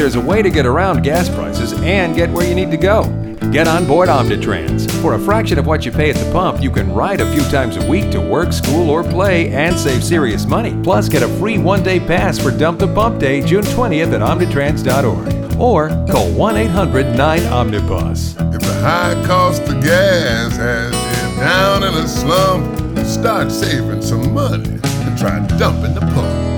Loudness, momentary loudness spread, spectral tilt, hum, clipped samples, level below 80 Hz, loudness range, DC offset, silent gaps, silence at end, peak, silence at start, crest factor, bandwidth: -14 LUFS; 5 LU; -6 dB/octave; none; under 0.1%; -26 dBFS; 1 LU; under 0.1%; none; 0 s; -2 dBFS; 0 s; 12 dB; over 20 kHz